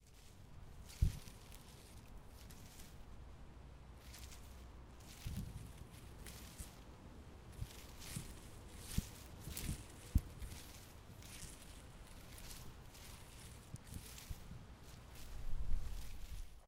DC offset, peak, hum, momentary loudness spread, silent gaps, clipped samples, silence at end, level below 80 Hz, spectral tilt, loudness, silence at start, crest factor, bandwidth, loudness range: under 0.1%; -20 dBFS; none; 13 LU; none; under 0.1%; 0 s; -50 dBFS; -4.5 dB/octave; -51 LUFS; 0 s; 26 dB; 16 kHz; 8 LU